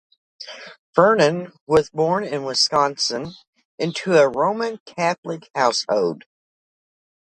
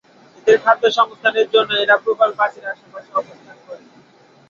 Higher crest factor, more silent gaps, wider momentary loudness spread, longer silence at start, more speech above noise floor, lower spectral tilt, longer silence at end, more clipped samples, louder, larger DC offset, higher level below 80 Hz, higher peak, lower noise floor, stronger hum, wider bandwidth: about the same, 20 dB vs 16 dB; first, 0.79-0.93 s, 1.61-1.67 s, 3.47-3.53 s, 3.65-3.78 s, 4.80-4.86 s, 5.18-5.23 s, 5.50-5.54 s vs none; first, 19 LU vs 15 LU; about the same, 0.4 s vs 0.45 s; first, over 70 dB vs 34 dB; first, -4 dB/octave vs -2.5 dB/octave; first, 1.05 s vs 0.75 s; neither; second, -20 LUFS vs -16 LUFS; neither; first, -60 dBFS vs -68 dBFS; about the same, -2 dBFS vs -2 dBFS; first, under -90 dBFS vs -50 dBFS; neither; first, 10.5 kHz vs 7.2 kHz